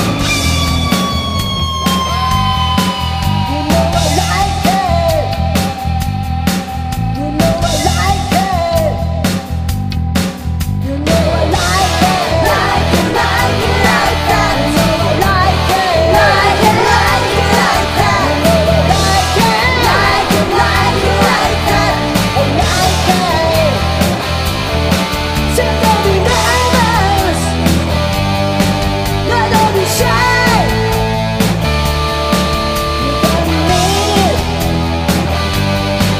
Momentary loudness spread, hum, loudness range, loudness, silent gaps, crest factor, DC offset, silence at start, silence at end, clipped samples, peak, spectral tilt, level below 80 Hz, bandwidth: 5 LU; none; 4 LU; -12 LUFS; none; 12 dB; 0.2%; 0 s; 0 s; under 0.1%; 0 dBFS; -4.5 dB/octave; -24 dBFS; 15.5 kHz